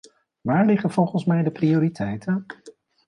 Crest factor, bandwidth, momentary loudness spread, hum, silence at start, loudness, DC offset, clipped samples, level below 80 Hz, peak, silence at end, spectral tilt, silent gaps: 16 dB; 10.5 kHz; 12 LU; none; 0.45 s; -22 LUFS; under 0.1%; under 0.1%; -60 dBFS; -8 dBFS; 0.4 s; -8.5 dB/octave; none